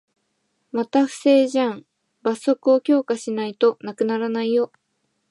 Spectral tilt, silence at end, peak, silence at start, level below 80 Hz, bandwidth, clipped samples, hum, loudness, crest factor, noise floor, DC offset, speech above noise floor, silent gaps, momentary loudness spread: -5 dB/octave; 0.65 s; -6 dBFS; 0.75 s; -80 dBFS; 11.5 kHz; under 0.1%; none; -21 LUFS; 16 dB; -72 dBFS; under 0.1%; 52 dB; none; 10 LU